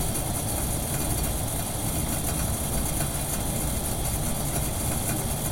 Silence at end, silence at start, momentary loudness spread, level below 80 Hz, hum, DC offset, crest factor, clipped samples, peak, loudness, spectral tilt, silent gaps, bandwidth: 0 s; 0 s; 1 LU; -34 dBFS; none; under 0.1%; 14 dB; under 0.1%; -12 dBFS; -27 LUFS; -4 dB/octave; none; 16.5 kHz